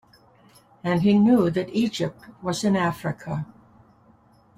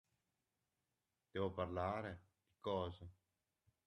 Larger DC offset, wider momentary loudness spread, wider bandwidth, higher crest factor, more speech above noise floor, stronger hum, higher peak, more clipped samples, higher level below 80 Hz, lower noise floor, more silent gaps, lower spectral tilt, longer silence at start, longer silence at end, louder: neither; about the same, 15 LU vs 16 LU; first, 15 kHz vs 11 kHz; about the same, 16 dB vs 20 dB; second, 34 dB vs over 46 dB; neither; first, -8 dBFS vs -28 dBFS; neither; first, -58 dBFS vs -76 dBFS; second, -56 dBFS vs under -90 dBFS; neither; about the same, -6.5 dB/octave vs -7.5 dB/octave; second, 0.85 s vs 1.35 s; first, 1.15 s vs 0.75 s; first, -23 LUFS vs -45 LUFS